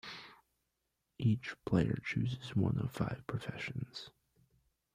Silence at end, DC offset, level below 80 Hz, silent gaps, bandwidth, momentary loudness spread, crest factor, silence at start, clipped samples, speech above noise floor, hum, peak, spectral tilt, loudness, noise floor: 0.85 s; under 0.1%; -62 dBFS; none; 14.5 kHz; 15 LU; 20 dB; 0.05 s; under 0.1%; 49 dB; none; -18 dBFS; -7.5 dB/octave; -37 LUFS; -85 dBFS